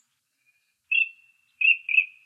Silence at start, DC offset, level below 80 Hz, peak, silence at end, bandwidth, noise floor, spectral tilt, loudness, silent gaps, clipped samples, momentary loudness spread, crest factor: 0.9 s; under 0.1%; under -90 dBFS; -8 dBFS; 0.2 s; 3.9 kHz; -71 dBFS; 4.5 dB/octave; -21 LUFS; none; under 0.1%; 6 LU; 20 dB